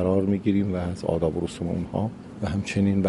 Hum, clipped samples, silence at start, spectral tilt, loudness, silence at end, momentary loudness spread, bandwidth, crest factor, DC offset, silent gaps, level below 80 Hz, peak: none; under 0.1%; 0 s; -7.5 dB/octave; -26 LUFS; 0 s; 7 LU; 11.5 kHz; 16 dB; under 0.1%; none; -46 dBFS; -8 dBFS